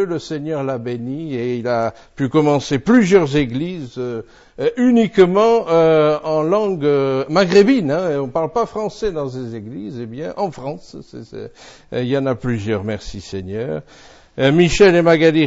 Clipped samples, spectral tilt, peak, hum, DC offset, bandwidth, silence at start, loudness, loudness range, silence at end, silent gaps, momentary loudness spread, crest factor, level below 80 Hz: under 0.1%; -6.5 dB/octave; -2 dBFS; none; under 0.1%; 8 kHz; 0 s; -17 LUFS; 10 LU; 0 s; none; 17 LU; 16 dB; -42 dBFS